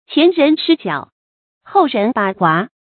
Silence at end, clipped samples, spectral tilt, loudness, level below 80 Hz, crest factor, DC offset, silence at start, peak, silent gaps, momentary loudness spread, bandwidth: 0.3 s; under 0.1%; -11 dB/octave; -15 LUFS; -64 dBFS; 16 dB; under 0.1%; 0.1 s; 0 dBFS; 1.12-1.61 s; 7 LU; 4.6 kHz